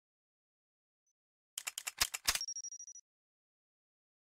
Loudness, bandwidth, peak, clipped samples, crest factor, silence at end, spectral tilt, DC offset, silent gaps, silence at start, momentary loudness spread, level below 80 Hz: -37 LUFS; 16 kHz; -18 dBFS; under 0.1%; 28 dB; 1.25 s; 1.5 dB/octave; under 0.1%; none; 1.55 s; 16 LU; -66 dBFS